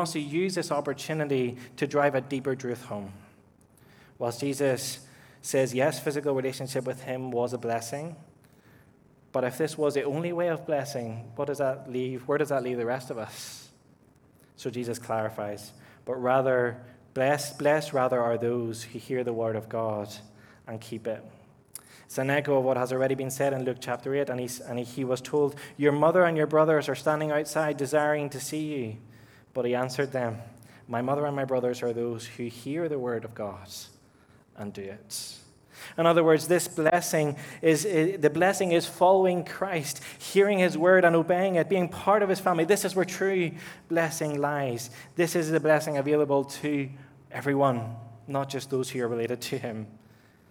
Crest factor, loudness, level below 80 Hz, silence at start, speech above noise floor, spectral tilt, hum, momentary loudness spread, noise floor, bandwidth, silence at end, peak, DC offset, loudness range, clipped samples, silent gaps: 22 dB; -27 LUFS; -72 dBFS; 0 s; 32 dB; -5 dB/octave; none; 15 LU; -59 dBFS; over 20 kHz; 0.55 s; -6 dBFS; under 0.1%; 9 LU; under 0.1%; none